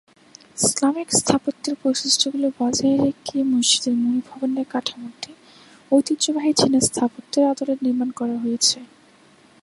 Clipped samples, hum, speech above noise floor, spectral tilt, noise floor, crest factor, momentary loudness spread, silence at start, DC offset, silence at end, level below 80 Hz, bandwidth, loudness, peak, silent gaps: under 0.1%; none; 32 dB; -3 dB/octave; -53 dBFS; 20 dB; 9 LU; 0.55 s; under 0.1%; 0.8 s; -58 dBFS; 11.5 kHz; -20 LUFS; 0 dBFS; none